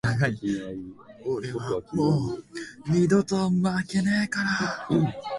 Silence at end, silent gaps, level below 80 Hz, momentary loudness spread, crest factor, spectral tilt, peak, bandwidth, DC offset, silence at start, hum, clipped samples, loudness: 0 s; none; -54 dBFS; 14 LU; 16 dB; -6.5 dB/octave; -10 dBFS; 11.5 kHz; under 0.1%; 0.05 s; none; under 0.1%; -26 LUFS